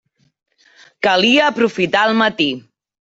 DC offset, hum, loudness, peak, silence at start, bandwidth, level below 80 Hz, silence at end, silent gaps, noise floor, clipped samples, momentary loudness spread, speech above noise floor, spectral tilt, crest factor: under 0.1%; none; -15 LUFS; -2 dBFS; 1 s; 8 kHz; -60 dBFS; 0.4 s; none; -50 dBFS; under 0.1%; 8 LU; 35 dB; -4 dB/octave; 16 dB